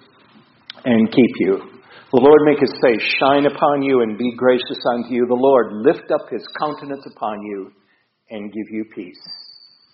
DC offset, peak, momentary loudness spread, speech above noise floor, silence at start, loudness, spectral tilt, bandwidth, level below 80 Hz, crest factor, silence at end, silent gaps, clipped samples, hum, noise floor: under 0.1%; 0 dBFS; 18 LU; 34 dB; 0.75 s; -17 LUFS; -4 dB/octave; 5.8 kHz; -60 dBFS; 18 dB; 0.5 s; none; under 0.1%; none; -51 dBFS